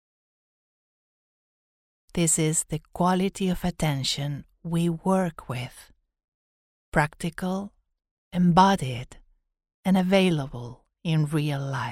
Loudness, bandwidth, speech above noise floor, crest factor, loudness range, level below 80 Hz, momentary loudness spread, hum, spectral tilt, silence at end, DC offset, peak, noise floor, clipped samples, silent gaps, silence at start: -25 LUFS; 15.5 kHz; over 65 dB; 22 dB; 5 LU; -50 dBFS; 14 LU; none; -5 dB/octave; 0 s; under 0.1%; -4 dBFS; under -90 dBFS; under 0.1%; 6.24-6.92 s, 8.11-8.31 s, 9.74-9.83 s; 2.15 s